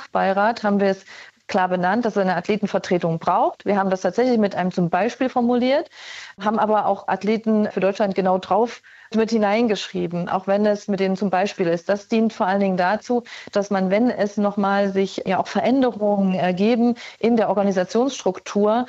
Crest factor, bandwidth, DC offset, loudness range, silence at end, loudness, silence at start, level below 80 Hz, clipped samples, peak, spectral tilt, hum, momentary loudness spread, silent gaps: 14 dB; 8 kHz; under 0.1%; 1 LU; 0 s; -21 LUFS; 0 s; -64 dBFS; under 0.1%; -6 dBFS; -6.5 dB/octave; none; 5 LU; none